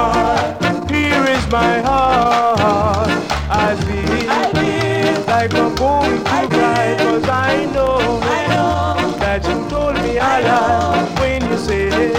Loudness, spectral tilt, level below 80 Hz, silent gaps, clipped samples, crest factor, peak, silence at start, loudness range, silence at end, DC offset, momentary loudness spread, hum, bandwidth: -15 LUFS; -5.5 dB/octave; -30 dBFS; none; under 0.1%; 14 dB; 0 dBFS; 0 s; 1 LU; 0 s; under 0.1%; 4 LU; none; 16.5 kHz